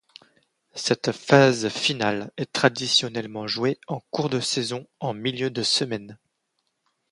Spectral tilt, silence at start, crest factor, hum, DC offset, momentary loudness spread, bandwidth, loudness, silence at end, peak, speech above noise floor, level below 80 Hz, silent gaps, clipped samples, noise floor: -4 dB/octave; 0.75 s; 24 dB; none; under 0.1%; 12 LU; 11.5 kHz; -23 LUFS; 0.95 s; 0 dBFS; 52 dB; -66 dBFS; none; under 0.1%; -75 dBFS